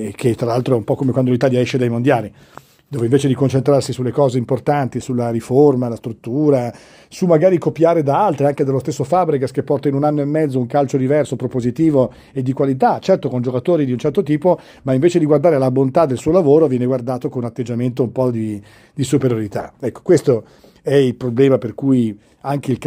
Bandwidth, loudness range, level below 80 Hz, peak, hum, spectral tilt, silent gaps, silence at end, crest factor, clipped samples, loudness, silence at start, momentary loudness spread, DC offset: 15.5 kHz; 3 LU; -52 dBFS; 0 dBFS; none; -7.5 dB/octave; none; 0 s; 16 dB; under 0.1%; -17 LUFS; 0 s; 9 LU; under 0.1%